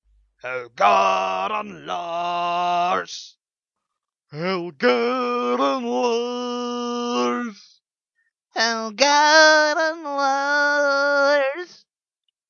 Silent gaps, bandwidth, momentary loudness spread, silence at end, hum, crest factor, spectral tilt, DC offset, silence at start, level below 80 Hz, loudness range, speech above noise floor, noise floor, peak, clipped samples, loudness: none; 7.4 kHz; 15 LU; 0.75 s; none; 22 dB; -2.5 dB/octave; under 0.1%; 0.45 s; -72 dBFS; 8 LU; 65 dB; -85 dBFS; 0 dBFS; under 0.1%; -20 LUFS